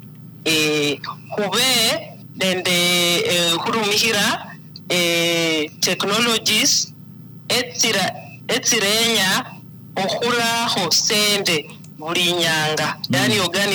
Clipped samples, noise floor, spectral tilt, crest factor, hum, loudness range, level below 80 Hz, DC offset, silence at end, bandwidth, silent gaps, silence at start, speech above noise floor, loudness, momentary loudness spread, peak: under 0.1%; -39 dBFS; -2 dB/octave; 14 dB; none; 1 LU; -62 dBFS; under 0.1%; 0 s; over 20 kHz; none; 0 s; 20 dB; -17 LUFS; 11 LU; -4 dBFS